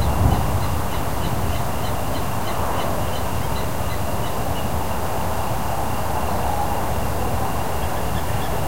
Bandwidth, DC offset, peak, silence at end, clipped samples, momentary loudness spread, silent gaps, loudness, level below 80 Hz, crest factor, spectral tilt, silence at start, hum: 16 kHz; 7%; -4 dBFS; 0 s; under 0.1%; 2 LU; none; -24 LUFS; -30 dBFS; 18 dB; -5.5 dB/octave; 0 s; none